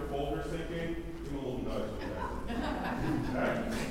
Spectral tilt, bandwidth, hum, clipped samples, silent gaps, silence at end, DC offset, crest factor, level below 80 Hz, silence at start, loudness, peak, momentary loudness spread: -6 dB/octave; 16 kHz; none; under 0.1%; none; 0 s; under 0.1%; 14 dB; -44 dBFS; 0 s; -36 LUFS; -20 dBFS; 6 LU